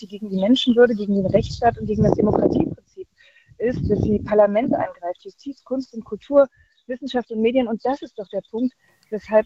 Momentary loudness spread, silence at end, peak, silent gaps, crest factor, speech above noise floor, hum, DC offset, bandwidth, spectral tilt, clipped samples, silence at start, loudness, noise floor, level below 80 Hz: 16 LU; 0 s; -2 dBFS; none; 20 dB; 33 dB; none; under 0.1%; 7.8 kHz; -7.5 dB/octave; under 0.1%; 0 s; -21 LUFS; -54 dBFS; -44 dBFS